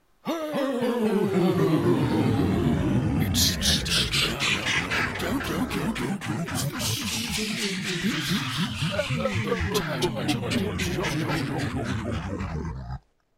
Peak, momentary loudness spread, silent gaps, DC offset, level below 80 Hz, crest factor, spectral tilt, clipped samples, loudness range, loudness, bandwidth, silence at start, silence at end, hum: -8 dBFS; 8 LU; none; under 0.1%; -42 dBFS; 18 dB; -4.5 dB/octave; under 0.1%; 5 LU; -25 LUFS; 16 kHz; 0.25 s; 0.4 s; none